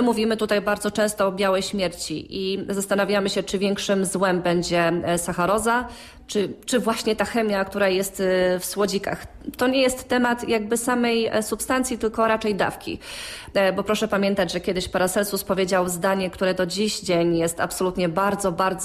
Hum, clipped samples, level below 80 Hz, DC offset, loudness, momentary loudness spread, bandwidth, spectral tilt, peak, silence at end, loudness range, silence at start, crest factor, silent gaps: none; under 0.1%; -50 dBFS; under 0.1%; -23 LUFS; 5 LU; 15.5 kHz; -4 dB/octave; -8 dBFS; 0 s; 1 LU; 0 s; 14 dB; none